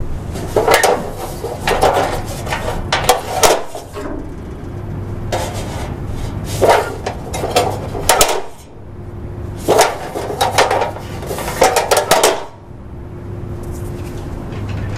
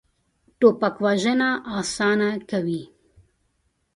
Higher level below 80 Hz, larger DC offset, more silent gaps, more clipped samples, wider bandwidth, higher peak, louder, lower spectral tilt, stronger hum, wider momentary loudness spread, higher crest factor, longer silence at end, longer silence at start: first, -30 dBFS vs -60 dBFS; neither; neither; neither; first, 16.5 kHz vs 11 kHz; first, 0 dBFS vs -4 dBFS; first, -17 LUFS vs -22 LUFS; second, -3.5 dB/octave vs -5 dB/octave; neither; first, 17 LU vs 8 LU; about the same, 18 dB vs 20 dB; second, 0 s vs 1.1 s; second, 0 s vs 0.6 s